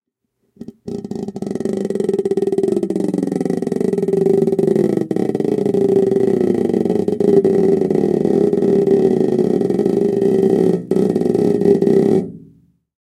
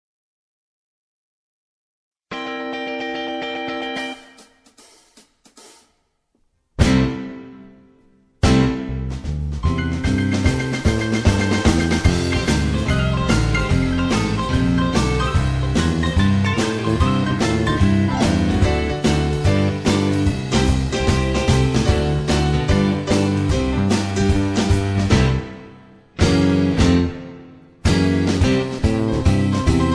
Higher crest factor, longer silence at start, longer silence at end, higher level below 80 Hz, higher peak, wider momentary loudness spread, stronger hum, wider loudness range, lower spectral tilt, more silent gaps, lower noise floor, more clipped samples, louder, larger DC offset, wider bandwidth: about the same, 16 dB vs 18 dB; second, 0.6 s vs 2.3 s; first, 0.65 s vs 0 s; second, -54 dBFS vs -28 dBFS; about the same, 0 dBFS vs 0 dBFS; about the same, 7 LU vs 9 LU; neither; second, 5 LU vs 10 LU; first, -9 dB/octave vs -6 dB/octave; neither; about the same, -69 dBFS vs -66 dBFS; neither; first, -16 LUFS vs -19 LUFS; neither; about the same, 11 kHz vs 11 kHz